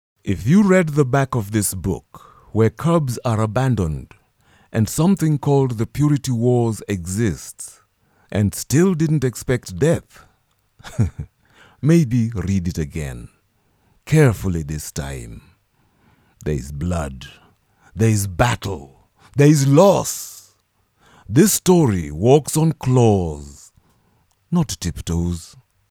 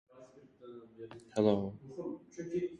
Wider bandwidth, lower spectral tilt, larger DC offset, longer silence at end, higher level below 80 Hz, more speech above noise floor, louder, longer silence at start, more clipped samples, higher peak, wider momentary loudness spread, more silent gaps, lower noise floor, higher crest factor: first, 18 kHz vs 10.5 kHz; about the same, -6.5 dB/octave vs -7.5 dB/octave; neither; first, 0.45 s vs 0 s; first, -40 dBFS vs -68 dBFS; first, 46 dB vs 23 dB; first, -19 LUFS vs -36 LUFS; about the same, 0.25 s vs 0.15 s; neither; first, 0 dBFS vs -14 dBFS; second, 16 LU vs 22 LU; neither; first, -63 dBFS vs -58 dBFS; second, 18 dB vs 24 dB